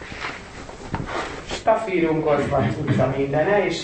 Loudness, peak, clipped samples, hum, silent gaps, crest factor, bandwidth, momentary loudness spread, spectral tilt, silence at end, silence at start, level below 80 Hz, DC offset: -22 LUFS; -6 dBFS; under 0.1%; none; none; 16 dB; 8.8 kHz; 12 LU; -6.5 dB/octave; 0 s; 0 s; -44 dBFS; 0.1%